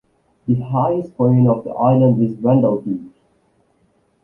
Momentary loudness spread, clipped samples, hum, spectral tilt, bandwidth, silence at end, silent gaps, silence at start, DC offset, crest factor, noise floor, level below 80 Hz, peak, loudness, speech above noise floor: 10 LU; under 0.1%; none; -12.5 dB/octave; 3.1 kHz; 1.15 s; none; 0.45 s; under 0.1%; 14 dB; -61 dBFS; -54 dBFS; -4 dBFS; -17 LUFS; 45 dB